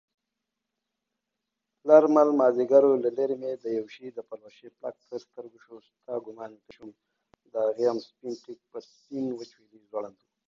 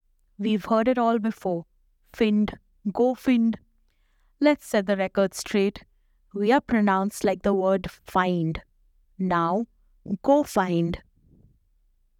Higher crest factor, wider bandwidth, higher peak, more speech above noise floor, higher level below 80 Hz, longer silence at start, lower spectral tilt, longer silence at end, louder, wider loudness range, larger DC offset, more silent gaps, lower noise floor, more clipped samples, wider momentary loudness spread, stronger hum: about the same, 22 dB vs 18 dB; second, 7.2 kHz vs 16.5 kHz; first, -4 dBFS vs -8 dBFS; first, 58 dB vs 41 dB; second, -80 dBFS vs -52 dBFS; first, 1.85 s vs 0.4 s; about the same, -7 dB/octave vs -6 dB/octave; second, 0.4 s vs 1.2 s; about the same, -25 LUFS vs -24 LUFS; first, 17 LU vs 2 LU; neither; neither; first, -85 dBFS vs -65 dBFS; neither; first, 24 LU vs 10 LU; neither